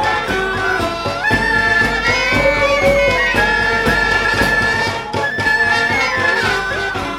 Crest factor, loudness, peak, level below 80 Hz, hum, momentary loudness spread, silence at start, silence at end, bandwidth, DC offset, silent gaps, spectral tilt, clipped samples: 14 dB; -14 LUFS; -2 dBFS; -32 dBFS; none; 5 LU; 0 s; 0 s; 18 kHz; under 0.1%; none; -4 dB/octave; under 0.1%